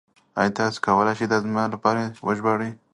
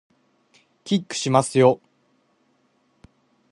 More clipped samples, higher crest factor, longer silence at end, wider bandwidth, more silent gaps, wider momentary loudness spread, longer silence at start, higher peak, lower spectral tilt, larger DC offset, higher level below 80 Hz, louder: neither; about the same, 20 dB vs 22 dB; second, 0.2 s vs 1.75 s; about the same, 11 kHz vs 11.5 kHz; neither; second, 6 LU vs 12 LU; second, 0.35 s vs 0.85 s; about the same, -4 dBFS vs -2 dBFS; about the same, -6 dB/octave vs -5.5 dB/octave; neither; first, -60 dBFS vs -66 dBFS; about the same, -23 LUFS vs -21 LUFS